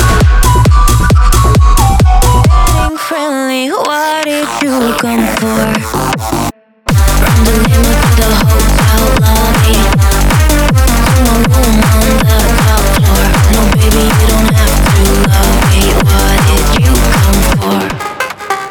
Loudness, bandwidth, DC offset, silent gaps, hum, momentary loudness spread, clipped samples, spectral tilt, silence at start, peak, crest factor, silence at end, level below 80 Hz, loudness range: -9 LUFS; over 20 kHz; under 0.1%; none; none; 6 LU; under 0.1%; -5 dB/octave; 0 s; 0 dBFS; 8 dB; 0 s; -12 dBFS; 4 LU